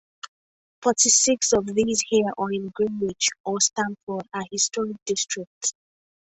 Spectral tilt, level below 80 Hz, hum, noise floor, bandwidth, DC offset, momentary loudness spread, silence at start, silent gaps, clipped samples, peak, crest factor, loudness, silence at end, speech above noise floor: -2 dB/octave; -60 dBFS; none; under -90 dBFS; 8.4 kHz; under 0.1%; 14 LU; 0.25 s; 0.28-0.82 s, 3.40-3.44 s, 4.03-4.07 s, 5.02-5.06 s, 5.47-5.61 s; under 0.1%; -4 dBFS; 20 dB; -23 LUFS; 0.5 s; over 66 dB